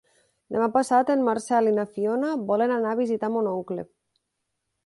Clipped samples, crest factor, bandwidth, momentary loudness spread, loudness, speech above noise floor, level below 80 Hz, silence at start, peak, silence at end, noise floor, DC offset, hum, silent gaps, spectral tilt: under 0.1%; 16 dB; 11.5 kHz; 10 LU; -24 LUFS; 56 dB; -70 dBFS; 0.5 s; -8 dBFS; 1 s; -79 dBFS; under 0.1%; none; none; -6 dB/octave